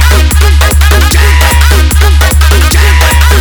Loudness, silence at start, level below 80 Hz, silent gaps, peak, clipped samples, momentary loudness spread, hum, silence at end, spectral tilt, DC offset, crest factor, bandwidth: -6 LUFS; 0 s; -6 dBFS; none; 0 dBFS; 5%; 1 LU; none; 0 s; -4 dB/octave; under 0.1%; 4 dB; over 20 kHz